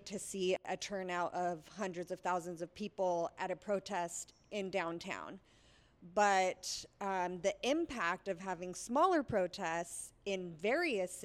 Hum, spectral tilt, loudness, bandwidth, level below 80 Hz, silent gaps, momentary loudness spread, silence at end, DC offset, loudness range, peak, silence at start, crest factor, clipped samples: none; -3.5 dB/octave; -38 LUFS; 15.5 kHz; -70 dBFS; none; 12 LU; 0 s; under 0.1%; 4 LU; -18 dBFS; 0 s; 20 dB; under 0.1%